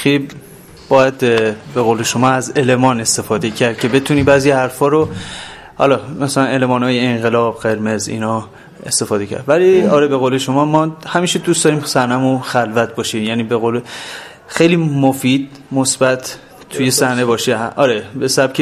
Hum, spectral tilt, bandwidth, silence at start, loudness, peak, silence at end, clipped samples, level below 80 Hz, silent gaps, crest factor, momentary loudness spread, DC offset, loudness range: none; -4.5 dB/octave; 15 kHz; 0 s; -14 LUFS; 0 dBFS; 0 s; under 0.1%; -48 dBFS; none; 14 dB; 9 LU; under 0.1%; 3 LU